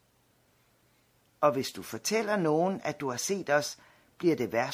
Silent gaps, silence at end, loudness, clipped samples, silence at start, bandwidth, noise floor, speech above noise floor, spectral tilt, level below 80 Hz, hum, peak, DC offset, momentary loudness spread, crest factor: none; 0 s; -30 LUFS; under 0.1%; 1.4 s; 16 kHz; -68 dBFS; 39 dB; -4 dB/octave; -74 dBFS; none; -10 dBFS; under 0.1%; 7 LU; 20 dB